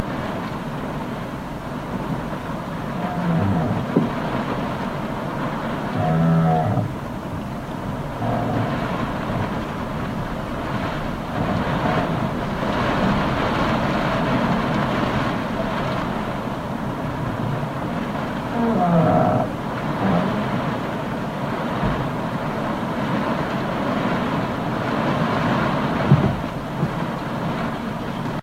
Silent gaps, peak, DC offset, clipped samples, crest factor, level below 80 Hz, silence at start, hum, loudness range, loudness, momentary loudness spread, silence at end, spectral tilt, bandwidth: none; -2 dBFS; under 0.1%; under 0.1%; 20 dB; -40 dBFS; 0 s; none; 4 LU; -23 LUFS; 9 LU; 0 s; -7.5 dB/octave; 16 kHz